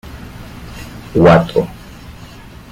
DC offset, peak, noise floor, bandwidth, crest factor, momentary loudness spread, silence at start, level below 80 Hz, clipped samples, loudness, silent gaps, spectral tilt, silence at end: under 0.1%; 0 dBFS; -35 dBFS; 15.5 kHz; 16 dB; 26 LU; 0.05 s; -36 dBFS; under 0.1%; -13 LUFS; none; -7.5 dB/octave; 0.6 s